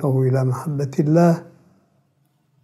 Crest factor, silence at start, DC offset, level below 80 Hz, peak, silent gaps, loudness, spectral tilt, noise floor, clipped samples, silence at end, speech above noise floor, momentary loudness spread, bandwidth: 16 dB; 0 s; under 0.1%; -70 dBFS; -4 dBFS; none; -19 LUFS; -9 dB/octave; -64 dBFS; under 0.1%; 1.2 s; 46 dB; 8 LU; 13 kHz